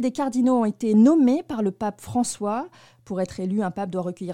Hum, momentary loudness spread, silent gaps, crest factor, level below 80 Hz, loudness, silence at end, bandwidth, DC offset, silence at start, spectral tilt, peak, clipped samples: none; 13 LU; none; 16 dB; -60 dBFS; -23 LUFS; 0 s; 13 kHz; 0.1%; 0 s; -6.5 dB/octave; -8 dBFS; under 0.1%